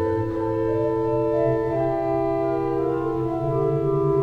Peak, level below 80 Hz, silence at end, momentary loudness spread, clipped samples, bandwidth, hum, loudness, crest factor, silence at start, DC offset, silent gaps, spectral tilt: -10 dBFS; -44 dBFS; 0 s; 3 LU; under 0.1%; 6 kHz; none; -23 LUFS; 12 dB; 0 s; under 0.1%; none; -10 dB/octave